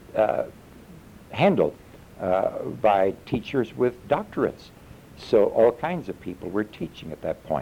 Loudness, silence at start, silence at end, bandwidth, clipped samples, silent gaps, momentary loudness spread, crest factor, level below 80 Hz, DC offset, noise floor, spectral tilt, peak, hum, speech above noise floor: -25 LUFS; 0.1 s; 0 s; 16.5 kHz; under 0.1%; none; 14 LU; 18 dB; -54 dBFS; under 0.1%; -46 dBFS; -7.5 dB/octave; -8 dBFS; none; 22 dB